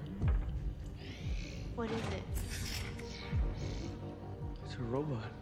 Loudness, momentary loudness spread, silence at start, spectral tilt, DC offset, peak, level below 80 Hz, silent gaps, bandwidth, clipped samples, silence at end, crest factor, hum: -40 LUFS; 8 LU; 0 s; -6 dB/octave; under 0.1%; -22 dBFS; -42 dBFS; none; 16.5 kHz; under 0.1%; 0 s; 16 dB; none